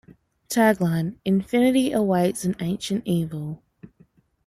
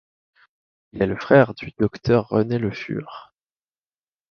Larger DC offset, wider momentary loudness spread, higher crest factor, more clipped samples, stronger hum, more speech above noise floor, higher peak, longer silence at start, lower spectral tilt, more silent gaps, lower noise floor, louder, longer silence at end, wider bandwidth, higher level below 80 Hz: neither; second, 10 LU vs 19 LU; about the same, 18 dB vs 20 dB; neither; neither; second, 37 dB vs over 70 dB; second, -6 dBFS vs -2 dBFS; second, 0.5 s vs 0.95 s; second, -6 dB/octave vs -8.5 dB/octave; neither; second, -58 dBFS vs under -90 dBFS; about the same, -23 LUFS vs -21 LUFS; second, 0.6 s vs 1.1 s; first, 15.5 kHz vs 6.8 kHz; second, -58 dBFS vs -50 dBFS